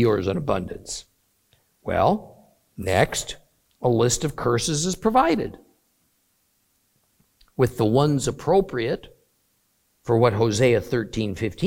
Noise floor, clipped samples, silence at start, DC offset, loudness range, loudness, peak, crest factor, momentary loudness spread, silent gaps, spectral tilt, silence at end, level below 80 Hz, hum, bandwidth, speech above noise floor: -68 dBFS; under 0.1%; 0 s; under 0.1%; 3 LU; -23 LUFS; -4 dBFS; 20 dB; 14 LU; none; -5 dB/octave; 0 s; -48 dBFS; none; 17 kHz; 46 dB